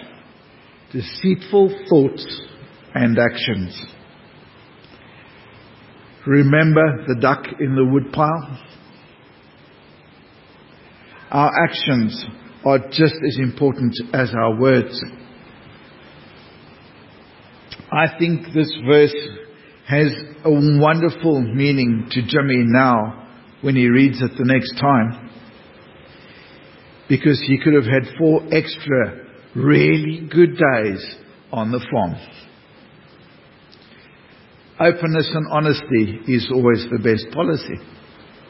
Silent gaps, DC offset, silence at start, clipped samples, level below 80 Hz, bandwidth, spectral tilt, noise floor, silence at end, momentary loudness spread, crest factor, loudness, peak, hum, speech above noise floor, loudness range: none; under 0.1%; 0 s; under 0.1%; -52 dBFS; 5.8 kHz; -11.5 dB/octave; -47 dBFS; 0.65 s; 16 LU; 18 dB; -17 LUFS; 0 dBFS; none; 31 dB; 8 LU